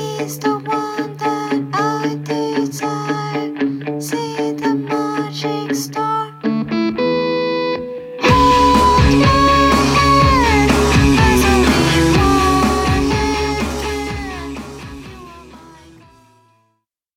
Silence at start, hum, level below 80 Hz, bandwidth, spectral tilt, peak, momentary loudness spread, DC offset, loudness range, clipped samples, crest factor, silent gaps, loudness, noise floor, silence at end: 0 s; none; -26 dBFS; 16.5 kHz; -5 dB/octave; -2 dBFS; 12 LU; under 0.1%; 9 LU; under 0.1%; 14 dB; none; -15 LUFS; -68 dBFS; 1.45 s